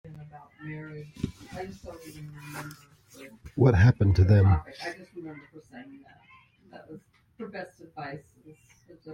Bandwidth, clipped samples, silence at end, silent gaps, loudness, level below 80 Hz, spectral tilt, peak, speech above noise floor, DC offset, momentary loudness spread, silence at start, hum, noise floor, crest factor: 11 kHz; under 0.1%; 0 s; none; -24 LUFS; -48 dBFS; -8 dB/octave; -10 dBFS; 29 dB; under 0.1%; 27 LU; 0.2 s; none; -57 dBFS; 20 dB